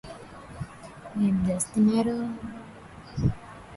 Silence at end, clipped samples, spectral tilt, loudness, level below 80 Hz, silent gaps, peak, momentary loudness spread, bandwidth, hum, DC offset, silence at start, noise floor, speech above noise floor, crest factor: 0 s; under 0.1%; -6.5 dB/octave; -27 LUFS; -46 dBFS; none; -10 dBFS; 21 LU; 11.5 kHz; none; under 0.1%; 0.05 s; -45 dBFS; 21 dB; 18 dB